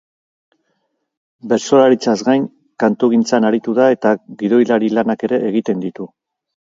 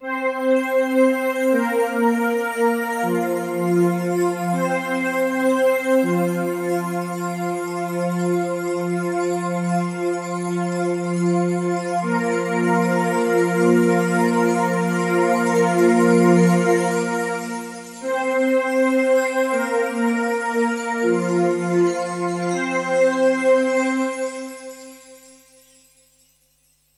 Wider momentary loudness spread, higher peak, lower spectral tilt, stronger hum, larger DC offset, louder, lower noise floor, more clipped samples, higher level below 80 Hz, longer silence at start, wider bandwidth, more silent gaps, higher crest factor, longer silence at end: about the same, 10 LU vs 8 LU; first, 0 dBFS vs -4 dBFS; about the same, -5.5 dB/octave vs -6 dB/octave; neither; neither; first, -15 LUFS vs -20 LUFS; first, -69 dBFS vs -62 dBFS; neither; first, -64 dBFS vs -72 dBFS; first, 1.45 s vs 0 s; second, 7.6 kHz vs 15.5 kHz; neither; about the same, 16 dB vs 16 dB; second, 0.7 s vs 1.8 s